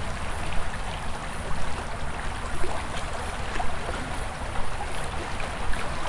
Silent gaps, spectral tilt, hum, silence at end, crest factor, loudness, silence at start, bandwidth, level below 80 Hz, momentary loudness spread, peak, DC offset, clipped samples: none; -4 dB/octave; none; 0 s; 14 dB; -33 LUFS; 0 s; 11.5 kHz; -34 dBFS; 2 LU; -12 dBFS; under 0.1%; under 0.1%